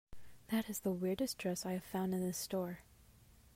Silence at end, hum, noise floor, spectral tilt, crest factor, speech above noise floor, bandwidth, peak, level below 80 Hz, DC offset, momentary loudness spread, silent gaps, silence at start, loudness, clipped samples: 0.05 s; none; -64 dBFS; -5 dB/octave; 16 dB; 25 dB; 16 kHz; -26 dBFS; -66 dBFS; under 0.1%; 4 LU; none; 0.1 s; -39 LUFS; under 0.1%